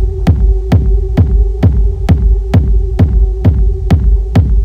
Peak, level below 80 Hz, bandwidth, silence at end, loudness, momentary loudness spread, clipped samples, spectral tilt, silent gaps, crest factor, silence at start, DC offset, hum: 0 dBFS; -10 dBFS; 5.2 kHz; 0 s; -12 LUFS; 1 LU; under 0.1%; -9 dB/octave; none; 8 dB; 0 s; under 0.1%; none